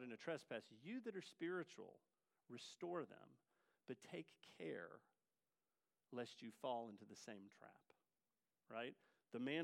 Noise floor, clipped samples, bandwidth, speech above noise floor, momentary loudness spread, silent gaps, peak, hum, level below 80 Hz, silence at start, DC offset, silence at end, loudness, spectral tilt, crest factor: under -90 dBFS; under 0.1%; 15.5 kHz; over 38 dB; 15 LU; none; -32 dBFS; none; under -90 dBFS; 0 s; under 0.1%; 0 s; -53 LUFS; -5 dB/octave; 22 dB